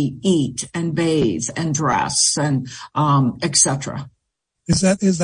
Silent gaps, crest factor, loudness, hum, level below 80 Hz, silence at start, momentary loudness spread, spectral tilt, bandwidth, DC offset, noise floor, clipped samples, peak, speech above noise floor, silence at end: none; 18 dB; -18 LUFS; none; -50 dBFS; 0 s; 10 LU; -4 dB/octave; 10.5 kHz; under 0.1%; -77 dBFS; under 0.1%; -2 dBFS; 58 dB; 0 s